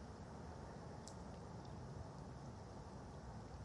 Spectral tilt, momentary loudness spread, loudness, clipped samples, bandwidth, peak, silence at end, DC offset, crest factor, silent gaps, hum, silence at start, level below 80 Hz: -6 dB/octave; 2 LU; -54 LUFS; under 0.1%; 11 kHz; -34 dBFS; 0 s; under 0.1%; 20 dB; none; none; 0 s; -62 dBFS